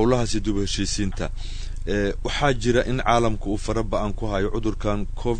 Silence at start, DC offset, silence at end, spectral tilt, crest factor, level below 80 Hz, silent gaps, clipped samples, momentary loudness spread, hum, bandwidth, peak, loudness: 0 s; under 0.1%; 0 s; -5 dB/octave; 18 dB; -28 dBFS; none; under 0.1%; 8 LU; none; 9.6 kHz; -4 dBFS; -24 LUFS